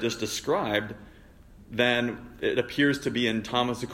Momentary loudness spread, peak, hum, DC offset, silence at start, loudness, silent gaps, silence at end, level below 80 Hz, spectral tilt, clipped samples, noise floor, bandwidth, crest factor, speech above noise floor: 9 LU; -10 dBFS; none; under 0.1%; 0 s; -27 LUFS; none; 0 s; -54 dBFS; -4 dB/octave; under 0.1%; -51 dBFS; 16 kHz; 18 dB; 24 dB